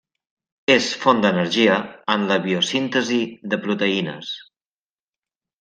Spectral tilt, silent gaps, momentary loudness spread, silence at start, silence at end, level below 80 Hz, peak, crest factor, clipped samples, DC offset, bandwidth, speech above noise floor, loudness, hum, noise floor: -4.5 dB/octave; none; 10 LU; 0.7 s; 1.2 s; -66 dBFS; -2 dBFS; 20 dB; under 0.1%; under 0.1%; 9.6 kHz; over 70 dB; -20 LUFS; none; under -90 dBFS